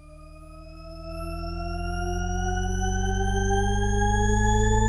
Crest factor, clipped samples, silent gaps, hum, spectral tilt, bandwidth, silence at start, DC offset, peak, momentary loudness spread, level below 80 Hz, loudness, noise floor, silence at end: 16 dB; under 0.1%; none; none; -5 dB/octave; 11 kHz; 0 s; under 0.1%; -10 dBFS; 21 LU; -28 dBFS; -26 LUFS; -45 dBFS; 0 s